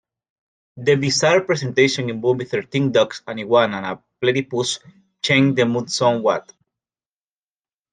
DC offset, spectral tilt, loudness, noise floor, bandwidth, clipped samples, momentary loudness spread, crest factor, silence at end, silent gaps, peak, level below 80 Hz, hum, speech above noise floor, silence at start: under 0.1%; -4.5 dB/octave; -19 LUFS; under -90 dBFS; 9.8 kHz; under 0.1%; 9 LU; 18 dB; 1.55 s; none; -2 dBFS; -62 dBFS; none; over 71 dB; 0.75 s